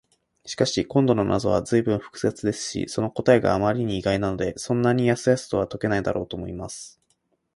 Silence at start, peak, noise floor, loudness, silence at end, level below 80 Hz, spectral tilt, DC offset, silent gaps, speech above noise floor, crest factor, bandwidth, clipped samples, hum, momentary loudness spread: 0.45 s; -4 dBFS; -70 dBFS; -23 LUFS; 0.7 s; -48 dBFS; -5.5 dB/octave; under 0.1%; none; 47 dB; 20 dB; 11.5 kHz; under 0.1%; none; 12 LU